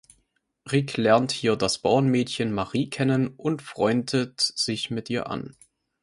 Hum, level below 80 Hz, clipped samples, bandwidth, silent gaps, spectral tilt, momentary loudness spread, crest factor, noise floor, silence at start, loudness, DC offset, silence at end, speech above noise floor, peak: none; -58 dBFS; under 0.1%; 11.5 kHz; none; -5 dB/octave; 8 LU; 20 dB; -71 dBFS; 0.65 s; -25 LUFS; under 0.1%; 0.5 s; 47 dB; -4 dBFS